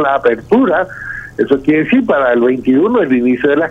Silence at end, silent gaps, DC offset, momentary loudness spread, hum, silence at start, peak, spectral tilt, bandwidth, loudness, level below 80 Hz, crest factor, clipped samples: 0 s; none; under 0.1%; 7 LU; none; 0 s; 0 dBFS; -8 dB/octave; 4 kHz; -12 LUFS; -44 dBFS; 12 dB; under 0.1%